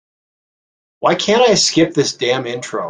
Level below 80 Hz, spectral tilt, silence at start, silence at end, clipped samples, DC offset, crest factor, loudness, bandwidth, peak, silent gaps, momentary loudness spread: -56 dBFS; -3.5 dB/octave; 1 s; 0 s; under 0.1%; under 0.1%; 16 dB; -15 LUFS; 10 kHz; -2 dBFS; none; 9 LU